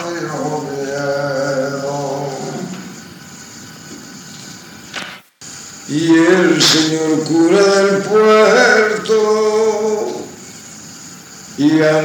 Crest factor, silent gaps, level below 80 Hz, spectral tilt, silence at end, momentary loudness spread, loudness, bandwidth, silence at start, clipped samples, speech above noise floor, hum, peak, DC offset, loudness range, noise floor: 16 dB; none; -62 dBFS; -4 dB/octave; 0 s; 23 LU; -14 LUFS; 19 kHz; 0 s; under 0.1%; 23 dB; none; 0 dBFS; under 0.1%; 17 LU; -35 dBFS